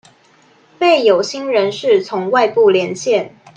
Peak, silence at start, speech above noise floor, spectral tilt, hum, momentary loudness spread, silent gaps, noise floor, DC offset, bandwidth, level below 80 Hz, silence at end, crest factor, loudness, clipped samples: 0 dBFS; 0.8 s; 37 dB; -4 dB/octave; none; 6 LU; none; -51 dBFS; under 0.1%; 9.2 kHz; -66 dBFS; 0.3 s; 14 dB; -14 LUFS; under 0.1%